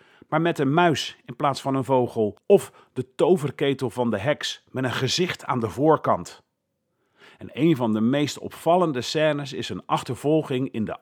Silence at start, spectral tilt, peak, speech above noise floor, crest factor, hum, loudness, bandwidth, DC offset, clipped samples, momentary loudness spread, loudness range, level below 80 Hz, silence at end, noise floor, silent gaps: 0.3 s; -5.5 dB/octave; -4 dBFS; 53 dB; 20 dB; none; -23 LUFS; 18.5 kHz; under 0.1%; under 0.1%; 8 LU; 2 LU; -66 dBFS; 0.05 s; -76 dBFS; none